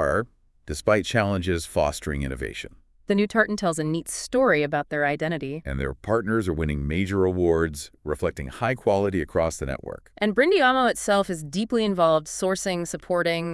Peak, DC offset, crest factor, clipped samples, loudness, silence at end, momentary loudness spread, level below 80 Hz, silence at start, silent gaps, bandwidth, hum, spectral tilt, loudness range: -6 dBFS; under 0.1%; 18 dB; under 0.1%; -24 LUFS; 0 s; 10 LU; -42 dBFS; 0 s; none; 12 kHz; none; -5 dB/octave; 3 LU